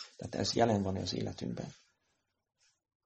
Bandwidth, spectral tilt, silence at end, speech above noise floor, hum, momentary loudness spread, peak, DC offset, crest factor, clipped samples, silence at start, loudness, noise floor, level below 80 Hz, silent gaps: 8.4 kHz; -5 dB/octave; 1.3 s; 47 dB; none; 13 LU; -14 dBFS; under 0.1%; 22 dB; under 0.1%; 0 s; -34 LUFS; -81 dBFS; -64 dBFS; none